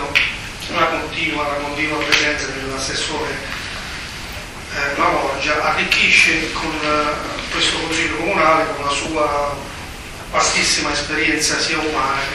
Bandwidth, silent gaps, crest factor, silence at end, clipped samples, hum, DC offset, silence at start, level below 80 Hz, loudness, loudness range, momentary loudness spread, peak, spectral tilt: 15.5 kHz; none; 20 dB; 0 s; under 0.1%; none; under 0.1%; 0 s; -38 dBFS; -17 LUFS; 5 LU; 12 LU; 0 dBFS; -2 dB/octave